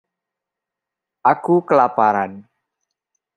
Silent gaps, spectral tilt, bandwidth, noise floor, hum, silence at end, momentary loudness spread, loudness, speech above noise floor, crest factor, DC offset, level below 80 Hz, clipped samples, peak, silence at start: none; -8.5 dB/octave; 9.6 kHz; -85 dBFS; none; 0.95 s; 7 LU; -17 LUFS; 69 dB; 18 dB; under 0.1%; -72 dBFS; under 0.1%; -2 dBFS; 1.25 s